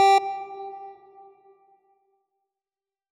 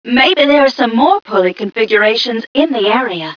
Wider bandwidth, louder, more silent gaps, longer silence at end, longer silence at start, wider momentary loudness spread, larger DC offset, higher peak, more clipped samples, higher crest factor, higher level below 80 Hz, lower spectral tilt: first, 12.5 kHz vs 5.4 kHz; second, -26 LUFS vs -12 LUFS; second, none vs 2.47-2.55 s; first, 2.2 s vs 0.05 s; about the same, 0 s vs 0.05 s; first, 25 LU vs 6 LU; neither; second, -10 dBFS vs 0 dBFS; neither; about the same, 16 dB vs 12 dB; second, -86 dBFS vs -54 dBFS; second, -1 dB/octave vs -5 dB/octave